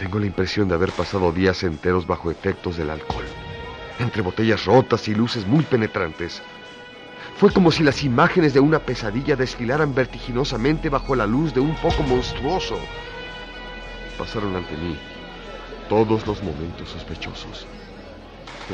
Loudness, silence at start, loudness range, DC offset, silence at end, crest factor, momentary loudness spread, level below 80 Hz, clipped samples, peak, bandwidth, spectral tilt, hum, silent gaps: -21 LUFS; 0 s; 8 LU; under 0.1%; 0 s; 20 dB; 19 LU; -38 dBFS; under 0.1%; -2 dBFS; 10 kHz; -6.5 dB/octave; none; none